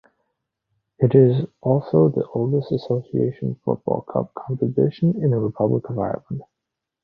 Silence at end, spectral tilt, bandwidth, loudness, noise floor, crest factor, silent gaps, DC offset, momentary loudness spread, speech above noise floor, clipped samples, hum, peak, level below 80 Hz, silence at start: 0.6 s; -12 dB/octave; 5.2 kHz; -21 LUFS; -83 dBFS; 20 dB; none; under 0.1%; 10 LU; 63 dB; under 0.1%; none; -2 dBFS; -56 dBFS; 1 s